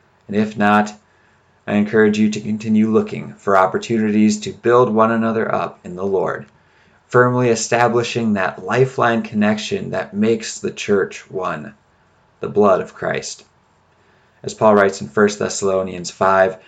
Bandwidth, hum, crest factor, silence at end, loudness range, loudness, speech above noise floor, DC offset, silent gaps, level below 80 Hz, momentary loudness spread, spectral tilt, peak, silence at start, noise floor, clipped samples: 9.2 kHz; none; 18 dB; 0.1 s; 5 LU; -17 LUFS; 39 dB; under 0.1%; none; -62 dBFS; 11 LU; -5.5 dB/octave; 0 dBFS; 0.3 s; -56 dBFS; under 0.1%